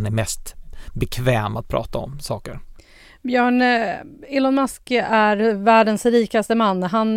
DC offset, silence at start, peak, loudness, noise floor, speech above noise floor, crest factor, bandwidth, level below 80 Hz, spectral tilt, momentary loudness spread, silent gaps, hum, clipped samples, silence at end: under 0.1%; 0 s; -2 dBFS; -19 LUFS; -46 dBFS; 27 dB; 18 dB; 16.5 kHz; -40 dBFS; -5.5 dB/octave; 15 LU; none; none; under 0.1%; 0 s